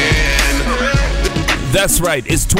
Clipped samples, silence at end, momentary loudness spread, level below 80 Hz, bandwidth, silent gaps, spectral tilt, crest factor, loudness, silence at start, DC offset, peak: under 0.1%; 0 s; 4 LU; -20 dBFS; 16.5 kHz; none; -3.5 dB/octave; 12 dB; -14 LUFS; 0 s; under 0.1%; -2 dBFS